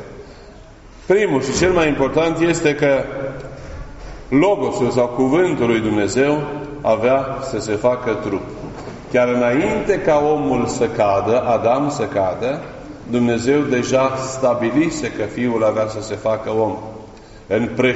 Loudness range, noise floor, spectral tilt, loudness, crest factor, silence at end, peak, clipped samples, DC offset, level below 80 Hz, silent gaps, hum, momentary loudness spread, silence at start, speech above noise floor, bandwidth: 2 LU; -40 dBFS; -5 dB/octave; -18 LUFS; 16 dB; 0 s; -2 dBFS; under 0.1%; under 0.1%; -42 dBFS; none; none; 15 LU; 0 s; 23 dB; 8 kHz